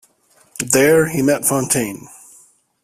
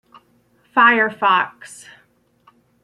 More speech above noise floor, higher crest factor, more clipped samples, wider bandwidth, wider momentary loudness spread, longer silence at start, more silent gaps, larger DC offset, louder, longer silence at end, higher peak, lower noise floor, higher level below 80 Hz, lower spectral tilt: about the same, 40 dB vs 42 dB; about the same, 18 dB vs 18 dB; neither; first, 16 kHz vs 12.5 kHz; second, 17 LU vs 23 LU; second, 0.6 s vs 0.75 s; neither; neither; about the same, -16 LUFS vs -16 LUFS; second, 0.75 s vs 1.1 s; about the same, 0 dBFS vs -2 dBFS; second, -55 dBFS vs -59 dBFS; first, -54 dBFS vs -72 dBFS; about the same, -4 dB/octave vs -3.5 dB/octave